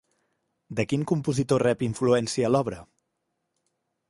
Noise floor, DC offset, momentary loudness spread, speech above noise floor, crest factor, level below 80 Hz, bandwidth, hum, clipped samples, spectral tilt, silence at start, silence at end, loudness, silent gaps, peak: -79 dBFS; under 0.1%; 10 LU; 54 dB; 20 dB; -58 dBFS; 11.5 kHz; none; under 0.1%; -6 dB/octave; 0.7 s; 1.25 s; -25 LUFS; none; -8 dBFS